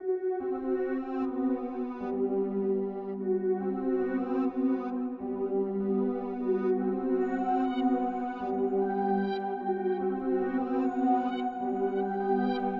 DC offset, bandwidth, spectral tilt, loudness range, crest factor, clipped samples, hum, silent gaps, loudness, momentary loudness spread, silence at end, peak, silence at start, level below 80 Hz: under 0.1%; 5 kHz; -9.5 dB/octave; 2 LU; 14 dB; under 0.1%; none; none; -30 LUFS; 4 LU; 0 s; -16 dBFS; 0 s; -64 dBFS